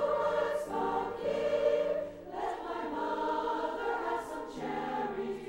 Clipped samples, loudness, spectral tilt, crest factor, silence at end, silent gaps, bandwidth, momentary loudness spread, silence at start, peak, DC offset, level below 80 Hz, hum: under 0.1%; -34 LUFS; -5 dB/octave; 16 dB; 0 s; none; 16.5 kHz; 8 LU; 0 s; -18 dBFS; under 0.1%; -60 dBFS; none